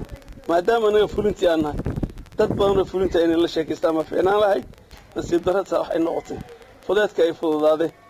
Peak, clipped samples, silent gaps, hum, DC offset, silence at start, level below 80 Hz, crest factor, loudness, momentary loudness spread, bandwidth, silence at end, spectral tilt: -8 dBFS; under 0.1%; none; none; under 0.1%; 0 s; -42 dBFS; 12 dB; -21 LUFS; 12 LU; 16 kHz; 0.2 s; -6 dB/octave